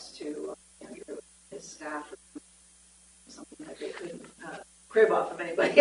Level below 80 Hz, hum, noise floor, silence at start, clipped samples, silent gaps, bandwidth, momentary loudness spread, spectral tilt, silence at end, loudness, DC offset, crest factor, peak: -70 dBFS; none; -58 dBFS; 0 s; under 0.1%; none; 11.5 kHz; 24 LU; -3.5 dB/octave; 0 s; -30 LUFS; under 0.1%; 26 dB; -4 dBFS